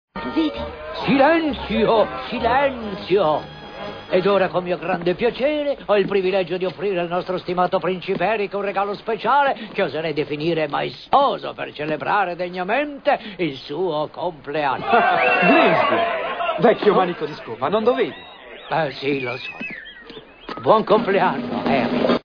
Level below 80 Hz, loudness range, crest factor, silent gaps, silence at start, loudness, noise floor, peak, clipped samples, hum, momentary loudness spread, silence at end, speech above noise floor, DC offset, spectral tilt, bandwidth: -50 dBFS; 5 LU; 18 dB; none; 0.15 s; -20 LUFS; -40 dBFS; -2 dBFS; under 0.1%; none; 12 LU; 0.05 s; 21 dB; under 0.1%; -7.5 dB/octave; 5.4 kHz